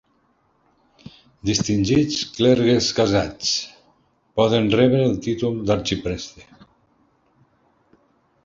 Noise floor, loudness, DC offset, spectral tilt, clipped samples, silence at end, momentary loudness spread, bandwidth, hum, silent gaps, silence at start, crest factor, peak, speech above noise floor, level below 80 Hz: -63 dBFS; -20 LUFS; under 0.1%; -5 dB/octave; under 0.1%; 2.05 s; 12 LU; 7.8 kHz; none; none; 1.45 s; 18 dB; -4 dBFS; 44 dB; -46 dBFS